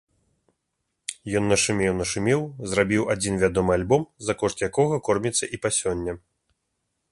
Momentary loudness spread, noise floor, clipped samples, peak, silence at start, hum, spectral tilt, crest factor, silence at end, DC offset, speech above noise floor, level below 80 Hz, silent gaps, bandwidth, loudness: 9 LU; -78 dBFS; under 0.1%; -6 dBFS; 1.1 s; none; -4.5 dB/octave; 20 dB; 0.95 s; under 0.1%; 55 dB; -48 dBFS; none; 11.5 kHz; -24 LUFS